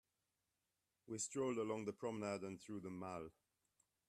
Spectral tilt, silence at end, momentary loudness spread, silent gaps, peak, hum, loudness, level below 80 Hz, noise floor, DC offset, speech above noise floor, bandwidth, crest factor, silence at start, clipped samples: -4.5 dB/octave; 0.8 s; 10 LU; none; -32 dBFS; none; -46 LUFS; -82 dBFS; -90 dBFS; under 0.1%; 44 dB; 13.5 kHz; 18 dB; 1.05 s; under 0.1%